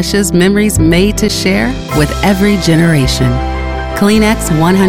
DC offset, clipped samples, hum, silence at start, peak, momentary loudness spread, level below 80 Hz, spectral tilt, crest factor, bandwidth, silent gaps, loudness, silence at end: 0.9%; under 0.1%; none; 0 s; 0 dBFS; 5 LU; -22 dBFS; -5 dB/octave; 10 dB; 16.5 kHz; none; -11 LUFS; 0 s